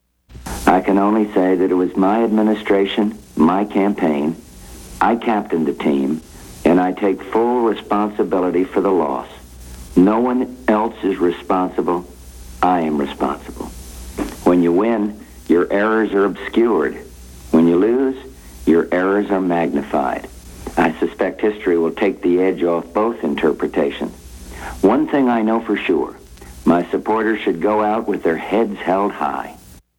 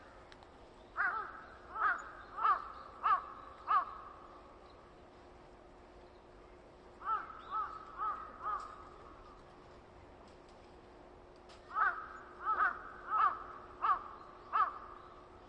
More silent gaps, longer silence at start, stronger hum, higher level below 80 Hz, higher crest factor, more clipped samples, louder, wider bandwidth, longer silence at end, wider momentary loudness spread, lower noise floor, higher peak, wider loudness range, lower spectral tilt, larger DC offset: neither; first, 0.3 s vs 0 s; neither; first, -42 dBFS vs -66 dBFS; about the same, 18 dB vs 20 dB; neither; first, -18 LUFS vs -37 LUFS; first, 17 kHz vs 8.8 kHz; first, 0.25 s vs 0 s; second, 13 LU vs 24 LU; second, -37 dBFS vs -58 dBFS; first, 0 dBFS vs -20 dBFS; second, 3 LU vs 11 LU; first, -6.5 dB/octave vs -4.5 dB/octave; neither